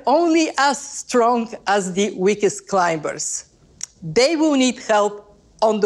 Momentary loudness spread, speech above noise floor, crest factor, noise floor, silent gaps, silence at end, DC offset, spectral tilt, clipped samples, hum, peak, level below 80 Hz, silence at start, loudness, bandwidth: 10 LU; 20 dB; 14 dB; -38 dBFS; none; 0 s; under 0.1%; -3.5 dB/octave; under 0.1%; none; -4 dBFS; -58 dBFS; 0.05 s; -19 LUFS; 12.5 kHz